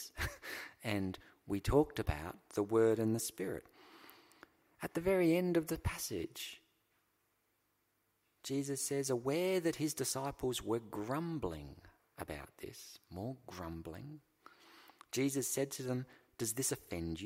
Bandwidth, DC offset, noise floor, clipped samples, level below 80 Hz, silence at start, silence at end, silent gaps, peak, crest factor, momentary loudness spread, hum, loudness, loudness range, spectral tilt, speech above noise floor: 16 kHz; under 0.1%; -80 dBFS; under 0.1%; -56 dBFS; 0 s; 0 s; none; -18 dBFS; 22 dB; 18 LU; none; -38 LUFS; 9 LU; -4.5 dB/octave; 43 dB